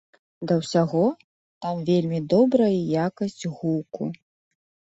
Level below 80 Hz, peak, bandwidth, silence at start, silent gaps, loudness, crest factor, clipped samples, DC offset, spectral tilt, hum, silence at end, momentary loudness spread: -64 dBFS; -8 dBFS; 8.2 kHz; 0.4 s; 1.24-1.61 s; -24 LUFS; 18 dB; under 0.1%; under 0.1%; -7.5 dB/octave; none; 0.75 s; 14 LU